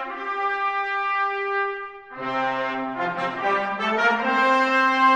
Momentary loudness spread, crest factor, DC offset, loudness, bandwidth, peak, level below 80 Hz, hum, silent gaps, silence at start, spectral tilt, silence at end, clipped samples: 10 LU; 16 dB; under 0.1%; -23 LUFS; 9.8 kHz; -8 dBFS; -66 dBFS; none; none; 0 s; -4 dB/octave; 0 s; under 0.1%